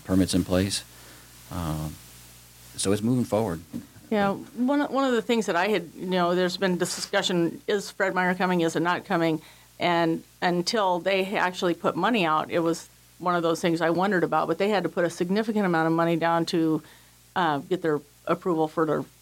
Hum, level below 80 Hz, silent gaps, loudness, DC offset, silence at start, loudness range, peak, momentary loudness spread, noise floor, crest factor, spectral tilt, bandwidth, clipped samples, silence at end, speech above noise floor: none; -56 dBFS; none; -25 LUFS; under 0.1%; 0.05 s; 4 LU; -8 dBFS; 8 LU; -49 dBFS; 16 dB; -5 dB/octave; 17 kHz; under 0.1%; 0.15 s; 24 dB